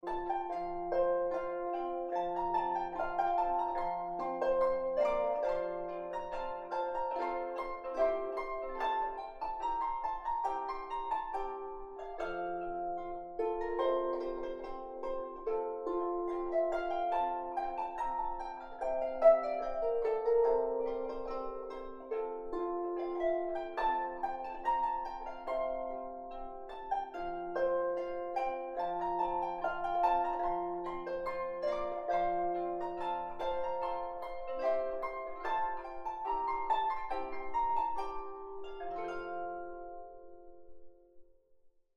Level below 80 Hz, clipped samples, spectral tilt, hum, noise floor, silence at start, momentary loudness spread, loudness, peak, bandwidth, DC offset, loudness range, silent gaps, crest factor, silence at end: -56 dBFS; under 0.1%; -6 dB/octave; none; -64 dBFS; 0.05 s; 10 LU; -36 LUFS; -14 dBFS; 7.8 kHz; under 0.1%; 5 LU; none; 22 dB; 0.3 s